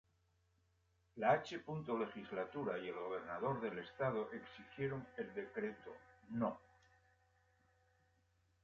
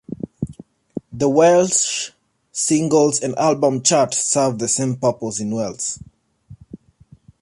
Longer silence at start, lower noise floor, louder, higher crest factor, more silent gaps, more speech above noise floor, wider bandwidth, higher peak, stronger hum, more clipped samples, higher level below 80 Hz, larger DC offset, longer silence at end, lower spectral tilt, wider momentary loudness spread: first, 1.15 s vs 0.1 s; first, -78 dBFS vs -50 dBFS; second, -43 LUFS vs -18 LUFS; first, 24 dB vs 16 dB; neither; about the same, 36 dB vs 33 dB; second, 7.4 kHz vs 11.5 kHz; second, -20 dBFS vs -4 dBFS; neither; neither; second, -76 dBFS vs -54 dBFS; neither; first, 2.05 s vs 0.65 s; about the same, -5 dB/octave vs -4 dB/octave; about the same, 15 LU vs 16 LU